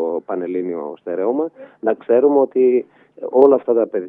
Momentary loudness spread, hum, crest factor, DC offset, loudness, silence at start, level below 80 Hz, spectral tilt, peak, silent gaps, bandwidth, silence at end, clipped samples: 13 LU; none; 18 dB; under 0.1%; -18 LUFS; 0 s; -76 dBFS; -10 dB/octave; 0 dBFS; none; 3.6 kHz; 0 s; under 0.1%